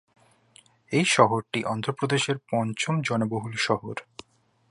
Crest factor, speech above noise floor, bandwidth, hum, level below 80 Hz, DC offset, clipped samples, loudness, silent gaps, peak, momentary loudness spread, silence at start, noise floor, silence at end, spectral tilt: 24 dB; 35 dB; 11.5 kHz; none; -66 dBFS; under 0.1%; under 0.1%; -25 LUFS; none; -2 dBFS; 9 LU; 0.9 s; -60 dBFS; 0.7 s; -4.5 dB/octave